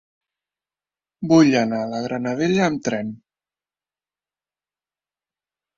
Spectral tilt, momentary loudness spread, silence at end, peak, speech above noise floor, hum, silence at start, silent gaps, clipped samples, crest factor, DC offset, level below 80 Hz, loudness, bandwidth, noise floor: -6 dB/octave; 13 LU; 2.6 s; -4 dBFS; over 71 dB; none; 1.2 s; none; under 0.1%; 20 dB; under 0.1%; -62 dBFS; -20 LUFS; 7.6 kHz; under -90 dBFS